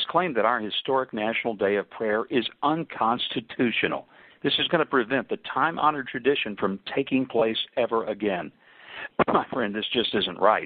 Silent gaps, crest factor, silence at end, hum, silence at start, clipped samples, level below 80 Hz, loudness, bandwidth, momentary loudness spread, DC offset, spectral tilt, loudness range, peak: none; 20 dB; 0 s; none; 0 s; under 0.1%; -62 dBFS; -25 LUFS; 4.8 kHz; 7 LU; under 0.1%; -9 dB/octave; 2 LU; -4 dBFS